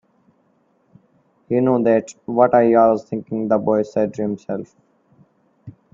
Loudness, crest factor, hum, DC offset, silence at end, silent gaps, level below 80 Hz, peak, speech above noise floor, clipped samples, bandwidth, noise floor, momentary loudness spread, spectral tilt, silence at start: -18 LUFS; 20 dB; none; under 0.1%; 0.25 s; none; -62 dBFS; 0 dBFS; 44 dB; under 0.1%; 7.6 kHz; -62 dBFS; 12 LU; -8 dB/octave; 1.5 s